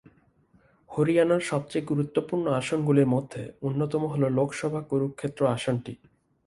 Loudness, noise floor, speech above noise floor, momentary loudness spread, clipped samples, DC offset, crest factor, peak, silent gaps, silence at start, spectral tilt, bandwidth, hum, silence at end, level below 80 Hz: -27 LUFS; -62 dBFS; 36 dB; 9 LU; under 0.1%; under 0.1%; 18 dB; -8 dBFS; none; 0.9 s; -7 dB/octave; 11.5 kHz; none; 0.5 s; -62 dBFS